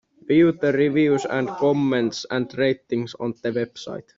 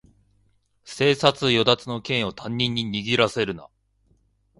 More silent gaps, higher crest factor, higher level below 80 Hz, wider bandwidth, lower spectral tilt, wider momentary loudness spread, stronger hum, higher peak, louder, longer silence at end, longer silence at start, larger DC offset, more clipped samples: neither; second, 14 dB vs 24 dB; second, -62 dBFS vs -56 dBFS; second, 7.6 kHz vs 11.5 kHz; first, -6.5 dB/octave vs -5 dB/octave; about the same, 10 LU vs 10 LU; second, none vs 50 Hz at -55 dBFS; second, -6 dBFS vs 0 dBFS; about the same, -22 LUFS vs -22 LUFS; second, 0.15 s vs 0.95 s; second, 0.3 s vs 0.85 s; neither; neither